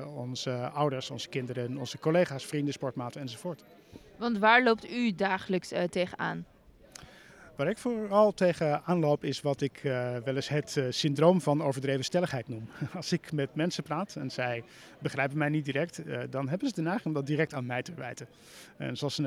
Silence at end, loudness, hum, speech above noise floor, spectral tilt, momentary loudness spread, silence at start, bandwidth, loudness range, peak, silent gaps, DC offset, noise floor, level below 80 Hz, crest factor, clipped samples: 0 s; -30 LUFS; none; 23 dB; -5.5 dB/octave; 14 LU; 0 s; 15.5 kHz; 5 LU; -8 dBFS; none; under 0.1%; -53 dBFS; -68 dBFS; 22 dB; under 0.1%